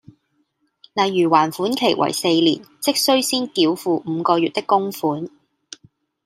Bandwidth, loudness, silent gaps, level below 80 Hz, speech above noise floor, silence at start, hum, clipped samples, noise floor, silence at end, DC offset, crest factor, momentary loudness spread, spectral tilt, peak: 16 kHz; -19 LUFS; none; -70 dBFS; 49 dB; 0.95 s; none; under 0.1%; -67 dBFS; 1 s; under 0.1%; 18 dB; 7 LU; -4 dB/octave; -2 dBFS